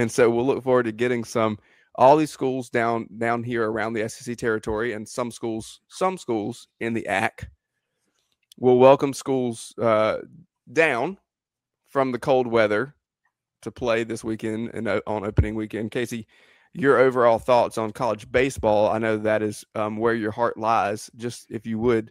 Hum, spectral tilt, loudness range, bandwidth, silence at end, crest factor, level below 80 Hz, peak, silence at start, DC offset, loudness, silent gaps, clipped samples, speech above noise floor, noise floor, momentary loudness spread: none; -6 dB/octave; 6 LU; 15.5 kHz; 0 s; 22 dB; -46 dBFS; -2 dBFS; 0 s; under 0.1%; -23 LUFS; none; under 0.1%; 65 dB; -87 dBFS; 13 LU